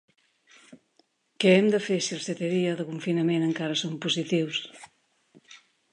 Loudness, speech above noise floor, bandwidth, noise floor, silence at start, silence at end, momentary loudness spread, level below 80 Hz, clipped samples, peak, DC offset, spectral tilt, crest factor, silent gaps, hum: -26 LUFS; 43 dB; 11 kHz; -68 dBFS; 0.7 s; 0.35 s; 10 LU; -78 dBFS; under 0.1%; -8 dBFS; under 0.1%; -5 dB/octave; 20 dB; none; none